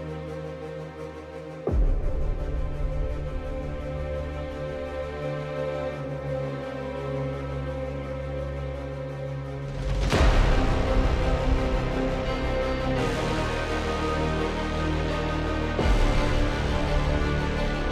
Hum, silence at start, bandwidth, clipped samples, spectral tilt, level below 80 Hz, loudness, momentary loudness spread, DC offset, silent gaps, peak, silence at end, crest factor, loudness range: none; 0 s; 11 kHz; under 0.1%; -6.5 dB/octave; -30 dBFS; -28 LUFS; 9 LU; under 0.1%; none; -8 dBFS; 0 s; 18 dB; 6 LU